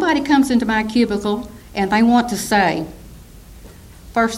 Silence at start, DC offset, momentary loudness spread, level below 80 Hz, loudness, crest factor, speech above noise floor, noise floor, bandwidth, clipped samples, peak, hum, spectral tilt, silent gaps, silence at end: 0 s; under 0.1%; 11 LU; -42 dBFS; -17 LUFS; 14 dB; 23 dB; -40 dBFS; 15.5 kHz; under 0.1%; -4 dBFS; none; -4.5 dB/octave; none; 0 s